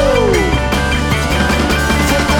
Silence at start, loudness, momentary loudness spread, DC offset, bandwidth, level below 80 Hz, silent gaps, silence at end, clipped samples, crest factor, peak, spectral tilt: 0 s; -13 LUFS; 2 LU; under 0.1%; over 20 kHz; -20 dBFS; none; 0 s; under 0.1%; 12 dB; 0 dBFS; -4.5 dB/octave